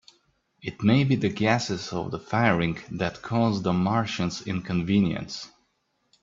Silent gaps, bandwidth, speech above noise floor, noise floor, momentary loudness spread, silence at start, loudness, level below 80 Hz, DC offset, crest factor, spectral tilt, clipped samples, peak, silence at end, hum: none; 7.8 kHz; 48 dB; -73 dBFS; 11 LU; 0.65 s; -25 LUFS; -56 dBFS; under 0.1%; 20 dB; -6 dB/octave; under 0.1%; -6 dBFS; 0.75 s; none